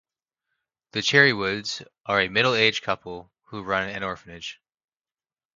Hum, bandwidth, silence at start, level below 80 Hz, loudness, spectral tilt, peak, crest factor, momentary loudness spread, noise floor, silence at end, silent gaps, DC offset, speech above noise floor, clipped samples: none; 7.6 kHz; 0.95 s; -60 dBFS; -22 LUFS; -3.5 dB/octave; -4 dBFS; 24 dB; 20 LU; under -90 dBFS; 1.05 s; 2.00-2.04 s; under 0.1%; over 66 dB; under 0.1%